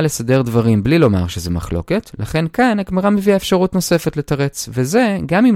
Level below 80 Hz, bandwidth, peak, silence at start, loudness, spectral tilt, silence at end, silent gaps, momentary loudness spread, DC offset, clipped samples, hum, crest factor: -38 dBFS; 16.5 kHz; 0 dBFS; 0 s; -16 LUFS; -6 dB/octave; 0 s; none; 7 LU; under 0.1%; under 0.1%; none; 14 dB